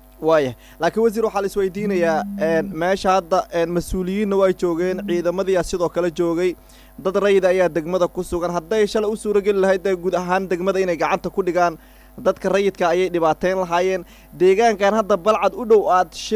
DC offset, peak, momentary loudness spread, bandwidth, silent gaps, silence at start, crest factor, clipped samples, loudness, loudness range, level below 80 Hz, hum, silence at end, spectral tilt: under 0.1%; -6 dBFS; 6 LU; 16 kHz; none; 0.2 s; 14 dB; under 0.1%; -19 LUFS; 2 LU; -44 dBFS; none; 0 s; -5.5 dB/octave